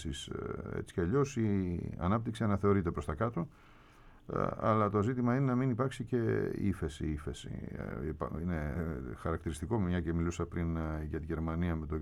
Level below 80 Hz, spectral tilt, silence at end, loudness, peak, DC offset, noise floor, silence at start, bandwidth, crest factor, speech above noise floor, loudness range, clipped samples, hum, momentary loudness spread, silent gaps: -48 dBFS; -7.5 dB/octave; 0 s; -35 LUFS; -18 dBFS; under 0.1%; -58 dBFS; 0 s; 12.5 kHz; 16 dB; 24 dB; 4 LU; under 0.1%; none; 10 LU; none